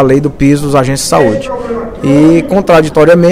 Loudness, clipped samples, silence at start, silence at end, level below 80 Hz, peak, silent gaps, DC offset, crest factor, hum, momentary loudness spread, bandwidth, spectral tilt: -9 LUFS; 2%; 0 s; 0 s; -30 dBFS; 0 dBFS; none; under 0.1%; 8 dB; none; 10 LU; 15.5 kHz; -6 dB/octave